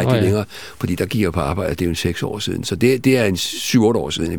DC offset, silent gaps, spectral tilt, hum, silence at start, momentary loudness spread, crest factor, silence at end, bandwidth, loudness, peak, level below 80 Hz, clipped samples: 0.7%; none; -5.5 dB/octave; none; 0 s; 8 LU; 16 dB; 0 s; 18 kHz; -19 LUFS; -2 dBFS; -40 dBFS; under 0.1%